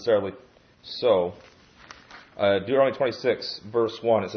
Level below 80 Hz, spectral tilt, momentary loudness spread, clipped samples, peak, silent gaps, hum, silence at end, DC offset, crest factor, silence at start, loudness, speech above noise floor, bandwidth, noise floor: -66 dBFS; -6 dB/octave; 15 LU; under 0.1%; -8 dBFS; none; none; 0 s; under 0.1%; 16 dB; 0 s; -25 LUFS; 25 dB; 6.6 kHz; -49 dBFS